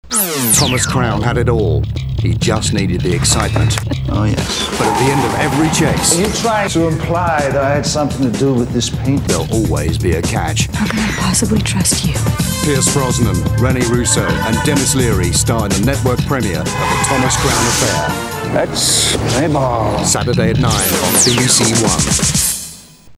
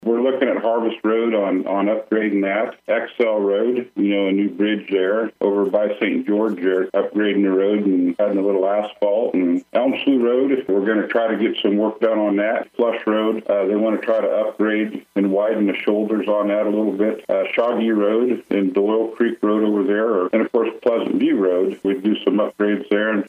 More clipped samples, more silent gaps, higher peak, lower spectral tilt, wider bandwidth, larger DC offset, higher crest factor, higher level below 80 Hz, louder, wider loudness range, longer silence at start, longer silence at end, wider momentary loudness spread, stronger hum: neither; neither; first, 0 dBFS vs -4 dBFS; second, -4 dB/octave vs -8 dB/octave; first, 19.5 kHz vs 4.5 kHz; neither; about the same, 14 dB vs 14 dB; first, -28 dBFS vs -76 dBFS; first, -14 LUFS vs -19 LUFS; about the same, 3 LU vs 1 LU; about the same, 0.05 s vs 0 s; about the same, 0 s vs 0 s; about the same, 5 LU vs 3 LU; neither